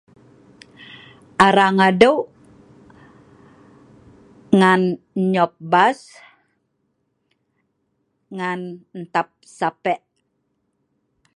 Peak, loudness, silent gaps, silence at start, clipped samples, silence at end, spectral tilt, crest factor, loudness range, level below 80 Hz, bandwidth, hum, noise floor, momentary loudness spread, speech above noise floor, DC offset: 0 dBFS; -18 LUFS; none; 1.4 s; under 0.1%; 1.4 s; -6 dB/octave; 22 dB; 10 LU; -60 dBFS; 10.5 kHz; none; -71 dBFS; 21 LU; 53 dB; under 0.1%